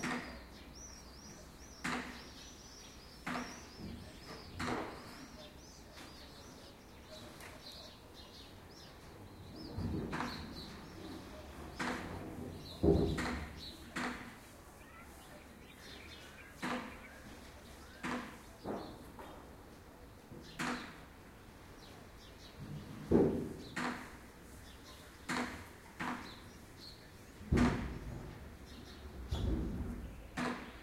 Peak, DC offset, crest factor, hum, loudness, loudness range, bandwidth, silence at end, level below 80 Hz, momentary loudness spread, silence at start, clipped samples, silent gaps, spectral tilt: -16 dBFS; under 0.1%; 28 dB; none; -42 LUFS; 9 LU; 16 kHz; 0 s; -52 dBFS; 17 LU; 0 s; under 0.1%; none; -5.5 dB/octave